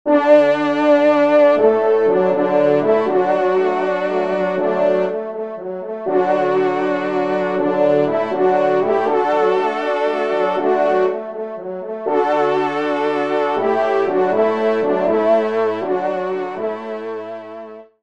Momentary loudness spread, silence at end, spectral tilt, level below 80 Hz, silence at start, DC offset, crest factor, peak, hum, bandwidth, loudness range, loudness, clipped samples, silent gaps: 13 LU; 0.2 s; -7 dB/octave; -68 dBFS; 0.05 s; 0.3%; 16 dB; 0 dBFS; none; 7.8 kHz; 4 LU; -17 LUFS; under 0.1%; none